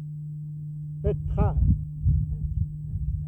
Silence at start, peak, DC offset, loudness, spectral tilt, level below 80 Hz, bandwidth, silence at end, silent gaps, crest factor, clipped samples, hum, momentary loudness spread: 0 s; -10 dBFS; under 0.1%; -28 LUFS; -12 dB/octave; -30 dBFS; 3.1 kHz; 0 s; none; 16 dB; under 0.1%; none; 12 LU